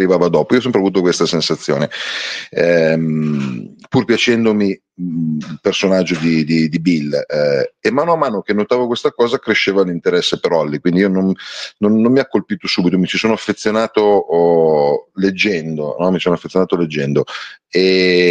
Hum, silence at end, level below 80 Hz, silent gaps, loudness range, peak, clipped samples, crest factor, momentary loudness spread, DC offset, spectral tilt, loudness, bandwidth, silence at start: none; 0 s; -54 dBFS; none; 2 LU; 0 dBFS; under 0.1%; 14 dB; 7 LU; under 0.1%; -5.5 dB/octave; -15 LUFS; 9.4 kHz; 0 s